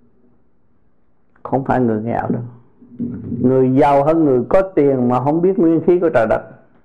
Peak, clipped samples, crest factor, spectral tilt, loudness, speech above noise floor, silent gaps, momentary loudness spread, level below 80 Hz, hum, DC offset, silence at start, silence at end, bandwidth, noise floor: -2 dBFS; under 0.1%; 14 dB; -10 dB/octave; -16 LUFS; 47 dB; none; 12 LU; -44 dBFS; none; under 0.1%; 1.45 s; 0.3 s; 7.6 kHz; -61 dBFS